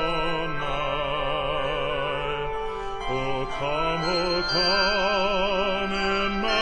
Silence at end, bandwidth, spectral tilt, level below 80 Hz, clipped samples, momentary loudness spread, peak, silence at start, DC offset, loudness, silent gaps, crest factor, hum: 0 s; 10 kHz; -4.5 dB/octave; -38 dBFS; under 0.1%; 7 LU; -10 dBFS; 0 s; under 0.1%; -25 LUFS; none; 16 dB; none